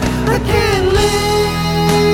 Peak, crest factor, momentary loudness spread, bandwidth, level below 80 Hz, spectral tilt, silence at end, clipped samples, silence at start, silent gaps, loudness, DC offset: 0 dBFS; 14 dB; 3 LU; 17.5 kHz; -24 dBFS; -5 dB/octave; 0 s; under 0.1%; 0 s; none; -14 LUFS; under 0.1%